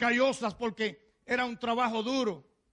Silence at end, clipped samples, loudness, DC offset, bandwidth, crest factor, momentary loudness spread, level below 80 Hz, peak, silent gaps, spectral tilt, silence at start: 0.3 s; under 0.1%; -31 LUFS; under 0.1%; 11 kHz; 16 dB; 7 LU; -66 dBFS; -16 dBFS; none; -4 dB/octave; 0 s